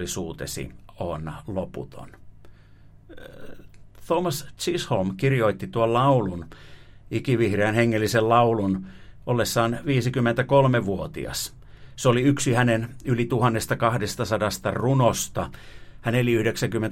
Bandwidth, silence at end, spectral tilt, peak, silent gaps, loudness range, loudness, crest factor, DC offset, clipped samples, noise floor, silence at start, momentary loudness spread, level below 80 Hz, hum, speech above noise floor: 16.5 kHz; 0 s; -5.5 dB/octave; -6 dBFS; none; 11 LU; -24 LUFS; 18 dB; under 0.1%; under 0.1%; -49 dBFS; 0 s; 14 LU; -48 dBFS; none; 26 dB